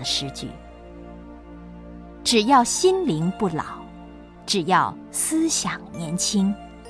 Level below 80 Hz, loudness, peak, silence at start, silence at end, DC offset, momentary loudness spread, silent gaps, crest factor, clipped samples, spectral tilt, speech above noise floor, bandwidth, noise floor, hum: -48 dBFS; -22 LUFS; -4 dBFS; 0 s; 0 s; under 0.1%; 24 LU; none; 20 dB; under 0.1%; -3.5 dB/octave; 20 dB; 11 kHz; -42 dBFS; none